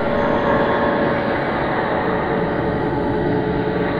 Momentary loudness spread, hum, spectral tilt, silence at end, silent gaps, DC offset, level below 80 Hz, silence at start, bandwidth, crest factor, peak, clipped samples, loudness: 3 LU; none; -8.5 dB/octave; 0 s; none; under 0.1%; -38 dBFS; 0 s; 6.8 kHz; 14 dB; -4 dBFS; under 0.1%; -19 LUFS